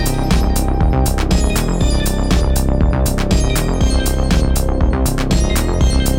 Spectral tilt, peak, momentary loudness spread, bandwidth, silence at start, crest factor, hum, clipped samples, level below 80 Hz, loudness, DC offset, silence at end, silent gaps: -5.5 dB/octave; -4 dBFS; 2 LU; 18 kHz; 0 s; 10 dB; none; under 0.1%; -16 dBFS; -16 LUFS; under 0.1%; 0 s; none